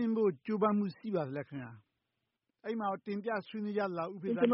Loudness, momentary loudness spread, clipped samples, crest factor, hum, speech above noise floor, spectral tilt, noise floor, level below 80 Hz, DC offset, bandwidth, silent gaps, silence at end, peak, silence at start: -35 LUFS; 12 LU; under 0.1%; 18 dB; none; 52 dB; -6.5 dB/octave; -86 dBFS; -80 dBFS; under 0.1%; 5.8 kHz; none; 0 s; -16 dBFS; 0 s